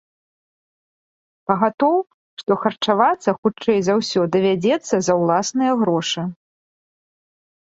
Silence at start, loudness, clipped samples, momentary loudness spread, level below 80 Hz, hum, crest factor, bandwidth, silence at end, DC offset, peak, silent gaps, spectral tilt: 1.5 s; -19 LUFS; under 0.1%; 7 LU; -64 dBFS; none; 20 dB; 8 kHz; 1.4 s; under 0.1%; -2 dBFS; 1.74-1.78 s, 2.14-2.37 s, 3.38-3.43 s; -5 dB/octave